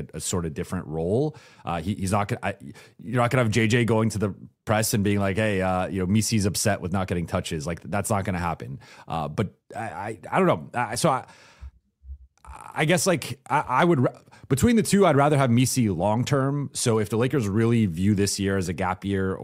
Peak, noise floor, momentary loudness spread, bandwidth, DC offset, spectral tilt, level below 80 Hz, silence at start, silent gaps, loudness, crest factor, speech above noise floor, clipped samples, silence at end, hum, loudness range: -6 dBFS; -46 dBFS; 11 LU; 16 kHz; under 0.1%; -5.5 dB/octave; -50 dBFS; 0 s; none; -24 LUFS; 18 dB; 22 dB; under 0.1%; 0 s; none; 6 LU